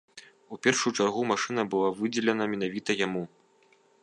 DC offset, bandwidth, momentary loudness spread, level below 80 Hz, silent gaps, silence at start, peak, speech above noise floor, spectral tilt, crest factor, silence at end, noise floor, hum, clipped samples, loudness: under 0.1%; 11 kHz; 6 LU; -72 dBFS; none; 0.15 s; -8 dBFS; 36 dB; -3.5 dB/octave; 22 dB; 0.75 s; -63 dBFS; none; under 0.1%; -28 LUFS